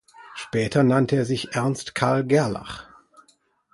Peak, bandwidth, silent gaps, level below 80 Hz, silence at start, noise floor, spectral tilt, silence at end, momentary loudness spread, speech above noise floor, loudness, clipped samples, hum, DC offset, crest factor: -4 dBFS; 11.5 kHz; none; -56 dBFS; 0.2 s; -63 dBFS; -6 dB/octave; 0.9 s; 18 LU; 41 dB; -22 LUFS; under 0.1%; none; under 0.1%; 20 dB